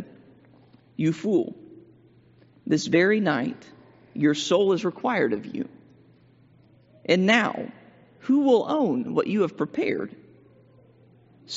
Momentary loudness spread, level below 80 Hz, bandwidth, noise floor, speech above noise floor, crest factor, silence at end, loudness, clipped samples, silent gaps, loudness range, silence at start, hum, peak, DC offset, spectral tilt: 18 LU; -72 dBFS; 8 kHz; -56 dBFS; 33 dB; 22 dB; 0 s; -24 LUFS; under 0.1%; none; 3 LU; 0 s; none; -4 dBFS; under 0.1%; -4.5 dB/octave